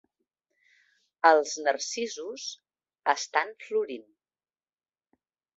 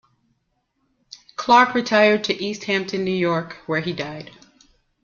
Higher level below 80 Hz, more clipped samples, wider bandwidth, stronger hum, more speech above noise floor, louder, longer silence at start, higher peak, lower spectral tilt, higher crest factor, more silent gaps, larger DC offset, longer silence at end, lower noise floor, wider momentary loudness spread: second, -86 dBFS vs -62 dBFS; neither; about the same, 8 kHz vs 7.4 kHz; neither; first, over 63 dB vs 51 dB; second, -28 LUFS vs -20 LUFS; second, 1.25 s vs 1.4 s; second, -6 dBFS vs -2 dBFS; second, -0.5 dB/octave vs -5 dB/octave; first, 26 dB vs 20 dB; neither; neither; first, 1.55 s vs 0.75 s; first, under -90 dBFS vs -71 dBFS; about the same, 16 LU vs 15 LU